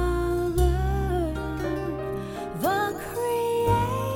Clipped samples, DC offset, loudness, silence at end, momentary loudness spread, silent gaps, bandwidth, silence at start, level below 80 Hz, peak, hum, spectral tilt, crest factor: under 0.1%; under 0.1%; -26 LUFS; 0 s; 7 LU; none; 19.5 kHz; 0 s; -32 dBFS; -10 dBFS; none; -6.5 dB/octave; 16 dB